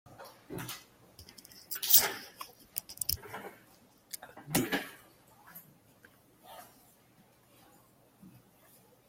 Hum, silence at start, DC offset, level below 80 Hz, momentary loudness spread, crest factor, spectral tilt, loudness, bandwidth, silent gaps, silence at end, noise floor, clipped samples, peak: none; 0.1 s; under 0.1%; -66 dBFS; 30 LU; 34 dB; -2 dB/octave; -30 LUFS; 16.5 kHz; none; 0.8 s; -64 dBFS; under 0.1%; -4 dBFS